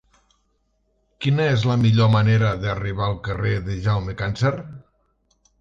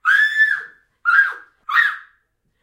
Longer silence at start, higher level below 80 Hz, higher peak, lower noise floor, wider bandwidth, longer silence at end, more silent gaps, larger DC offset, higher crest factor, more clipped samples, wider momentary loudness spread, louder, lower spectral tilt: first, 1.2 s vs 0.05 s; first, -42 dBFS vs -74 dBFS; about the same, -6 dBFS vs -4 dBFS; about the same, -67 dBFS vs -66 dBFS; second, 7.4 kHz vs 16.5 kHz; first, 0.8 s vs 0.6 s; neither; neither; about the same, 16 dB vs 16 dB; neither; second, 9 LU vs 12 LU; second, -21 LUFS vs -16 LUFS; first, -7.5 dB/octave vs 2 dB/octave